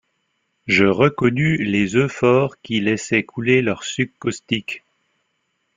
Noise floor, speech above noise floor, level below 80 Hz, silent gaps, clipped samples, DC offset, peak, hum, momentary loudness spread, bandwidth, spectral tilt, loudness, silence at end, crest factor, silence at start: -71 dBFS; 52 dB; -54 dBFS; none; under 0.1%; under 0.1%; -2 dBFS; none; 8 LU; 9.4 kHz; -5.5 dB/octave; -19 LUFS; 1 s; 18 dB; 0.65 s